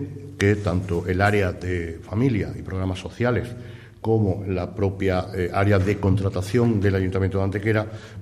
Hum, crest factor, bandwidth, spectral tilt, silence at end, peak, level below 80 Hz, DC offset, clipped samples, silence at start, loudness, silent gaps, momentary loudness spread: none; 16 dB; 12.5 kHz; -7.5 dB/octave; 0 s; -6 dBFS; -44 dBFS; under 0.1%; under 0.1%; 0 s; -23 LUFS; none; 9 LU